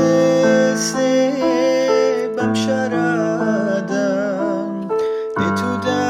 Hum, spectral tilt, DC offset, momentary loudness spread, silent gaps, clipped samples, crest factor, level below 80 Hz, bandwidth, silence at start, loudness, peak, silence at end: none; -5 dB/octave; under 0.1%; 7 LU; none; under 0.1%; 14 dB; -62 dBFS; 15 kHz; 0 s; -18 LUFS; -4 dBFS; 0 s